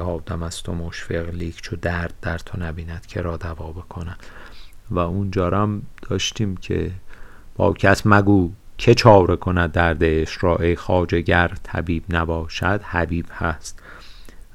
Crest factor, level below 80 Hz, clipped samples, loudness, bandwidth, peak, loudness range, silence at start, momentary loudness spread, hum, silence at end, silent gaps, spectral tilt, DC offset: 20 dB; -36 dBFS; under 0.1%; -21 LUFS; 13.5 kHz; 0 dBFS; 12 LU; 0 s; 16 LU; none; 0.15 s; none; -6 dB/octave; under 0.1%